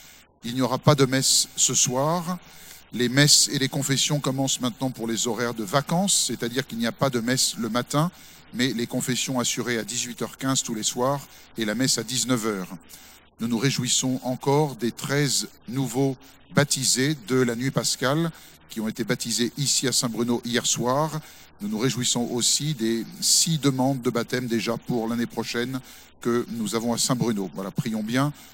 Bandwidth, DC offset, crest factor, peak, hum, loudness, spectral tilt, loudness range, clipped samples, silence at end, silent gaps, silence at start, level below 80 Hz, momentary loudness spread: 16.5 kHz; under 0.1%; 24 dB; 0 dBFS; none; -23 LUFS; -3.5 dB/octave; 5 LU; under 0.1%; 0 s; none; 0 s; -60 dBFS; 11 LU